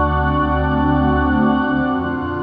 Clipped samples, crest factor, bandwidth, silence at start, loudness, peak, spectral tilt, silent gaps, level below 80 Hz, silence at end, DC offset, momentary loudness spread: under 0.1%; 12 dB; 5 kHz; 0 s; -17 LUFS; -4 dBFS; -10.5 dB/octave; none; -26 dBFS; 0 s; under 0.1%; 4 LU